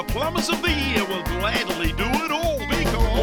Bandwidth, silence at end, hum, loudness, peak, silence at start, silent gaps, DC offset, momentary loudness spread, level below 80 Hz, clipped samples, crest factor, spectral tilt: 19.5 kHz; 0 s; none; -23 LUFS; -8 dBFS; 0 s; none; under 0.1%; 3 LU; -28 dBFS; under 0.1%; 14 dB; -4.5 dB/octave